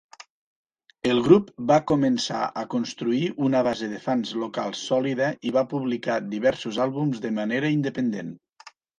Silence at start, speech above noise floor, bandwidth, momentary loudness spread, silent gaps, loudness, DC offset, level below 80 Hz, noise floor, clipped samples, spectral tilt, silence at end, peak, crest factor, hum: 0.2 s; 28 dB; 9.8 kHz; 9 LU; 0.30-0.65 s; -24 LUFS; under 0.1%; -62 dBFS; -51 dBFS; under 0.1%; -6 dB/octave; 0.3 s; -4 dBFS; 20 dB; none